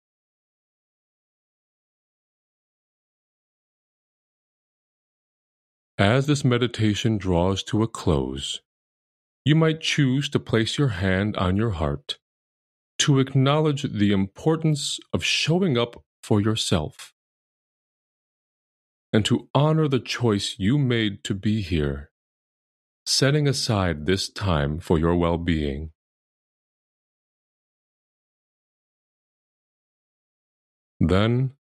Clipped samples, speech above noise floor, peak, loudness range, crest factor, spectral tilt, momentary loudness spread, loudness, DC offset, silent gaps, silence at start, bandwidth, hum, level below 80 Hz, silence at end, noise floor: under 0.1%; over 68 dB; -2 dBFS; 5 LU; 22 dB; -5.5 dB/octave; 8 LU; -23 LUFS; under 0.1%; 8.65-9.45 s, 12.22-12.99 s, 16.06-16.23 s, 17.12-19.13 s, 19.50-19.54 s, 22.11-23.06 s, 25.95-31.00 s; 6 s; 13.5 kHz; none; -44 dBFS; 0.2 s; under -90 dBFS